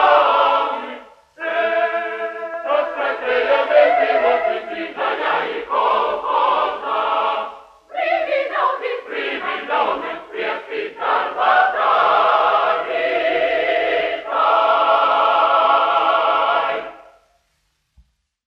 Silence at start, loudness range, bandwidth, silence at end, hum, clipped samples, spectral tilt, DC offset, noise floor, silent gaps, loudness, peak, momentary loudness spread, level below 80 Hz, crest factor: 0 s; 5 LU; 6.8 kHz; 1.45 s; none; under 0.1%; -3.5 dB/octave; under 0.1%; -67 dBFS; none; -18 LUFS; -2 dBFS; 11 LU; -60 dBFS; 18 dB